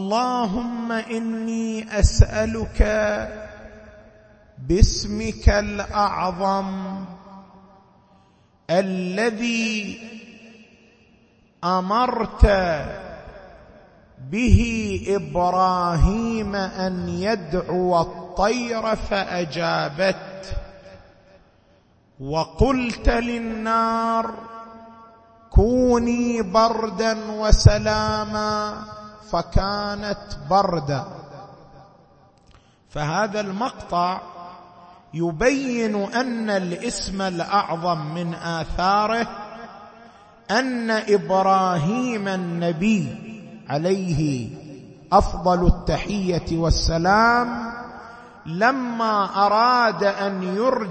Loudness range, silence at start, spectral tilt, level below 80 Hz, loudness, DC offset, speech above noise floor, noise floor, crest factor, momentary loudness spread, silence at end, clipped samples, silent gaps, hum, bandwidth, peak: 6 LU; 0 s; -5.5 dB/octave; -30 dBFS; -22 LUFS; under 0.1%; 36 dB; -57 dBFS; 22 dB; 18 LU; 0 s; under 0.1%; none; none; 8.8 kHz; 0 dBFS